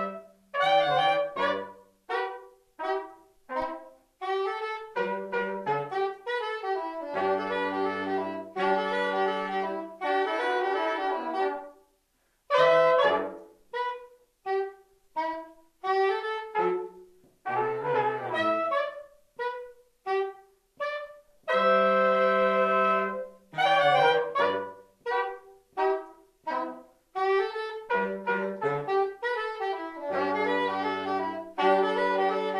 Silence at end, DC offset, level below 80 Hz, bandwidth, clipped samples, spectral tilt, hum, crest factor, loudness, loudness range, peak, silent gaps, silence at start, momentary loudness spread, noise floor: 0 s; under 0.1%; -72 dBFS; 12 kHz; under 0.1%; -5.5 dB/octave; none; 20 dB; -28 LUFS; 7 LU; -10 dBFS; none; 0 s; 15 LU; -71 dBFS